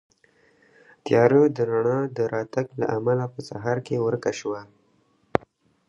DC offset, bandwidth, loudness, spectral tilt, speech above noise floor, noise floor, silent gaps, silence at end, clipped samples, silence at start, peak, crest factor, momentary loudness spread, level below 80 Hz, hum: under 0.1%; 10.5 kHz; -24 LUFS; -7 dB/octave; 41 dB; -64 dBFS; none; 1.25 s; under 0.1%; 1.05 s; 0 dBFS; 24 dB; 13 LU; -62 dBFS; none